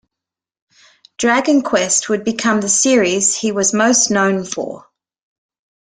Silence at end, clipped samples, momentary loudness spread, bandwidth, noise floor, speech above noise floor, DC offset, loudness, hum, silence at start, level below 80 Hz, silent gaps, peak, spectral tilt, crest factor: 1.1 s; under 0.1%; 9 LU; 10.5 kHz; -85 dBFS; 70 dB; under 0.1%; -15 LUFS; none; 1.2 s; -58 dBFS; none; -2 dBFS; -2.5 dB/octave; 16 dB